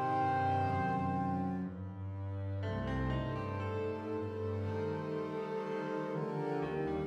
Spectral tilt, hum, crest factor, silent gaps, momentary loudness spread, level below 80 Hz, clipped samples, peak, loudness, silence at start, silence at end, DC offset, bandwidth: -8.5 dB/octave; none; 14 dB; none; 7 LU; -54 dBFS; under 0.1%; -22 dBFS; -37 LUFS; 0 s; 0 s; under 0.1%; 8 kHz